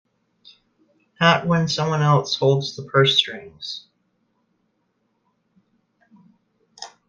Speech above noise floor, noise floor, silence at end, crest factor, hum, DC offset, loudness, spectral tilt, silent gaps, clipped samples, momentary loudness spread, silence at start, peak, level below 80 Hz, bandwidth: 51 dB; -70 dBFS; 0.2 s; 22 dB; none; under 0.1%; -19 LUFS; -5 dB/octave; none; under 0.1%; 17 LU; 1.2 s; -2 dBFS; -64 dBFS; 7.6 kHz